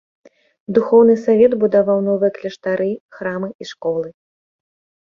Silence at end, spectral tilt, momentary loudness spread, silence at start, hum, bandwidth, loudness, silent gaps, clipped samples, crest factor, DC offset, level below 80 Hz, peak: 0.95 s; -7.5 dB/octave; 14 LU; 0.7 s; none; 7.2 kHz; -17 LUFS; 3.00-3.09 s, 3.55-3.59 s; under 0.1%; 18 dB; under 0.1%; -60 dBFS; 0 dBFS